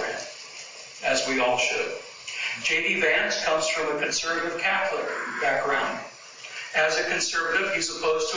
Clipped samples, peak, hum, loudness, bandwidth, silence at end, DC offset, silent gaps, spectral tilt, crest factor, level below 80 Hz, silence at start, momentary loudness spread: under 0.1%; -10 dBFS; none; -24 LUFS; 7.8 kHz; 0 s; under 0.1%; none; -1 dB/octave; 18 dB; -62 dBFS; 0 s; 14 LU